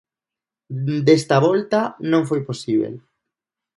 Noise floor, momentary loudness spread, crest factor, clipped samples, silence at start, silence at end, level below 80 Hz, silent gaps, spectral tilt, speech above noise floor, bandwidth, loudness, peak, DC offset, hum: -88 dBFS; 13 LU; 18 dB; under 0.1%; 0.7 s; 0.8 s; -66 dBFS; none; -6.5 dB/octave; 70 dB; 11.5 kHz; -19 LUFS; -2 dBFS; under 0.1%; none